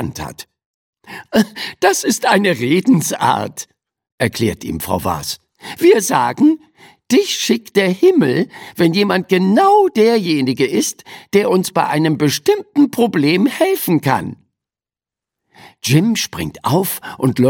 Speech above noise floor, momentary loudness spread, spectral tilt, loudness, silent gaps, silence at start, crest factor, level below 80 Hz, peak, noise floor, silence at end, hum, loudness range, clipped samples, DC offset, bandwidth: over 75 dB; 12 LU; -5 dB/octave; -15 LUFS; 0.66-0.93 s, 4.12-4.18 s; 0 s; 16 dB; -50 dBFS; 0 dBFS; under -90 dBFS; 0 s; none; 4 LU; under 0.1%; under 0.1%; 17.5 kHz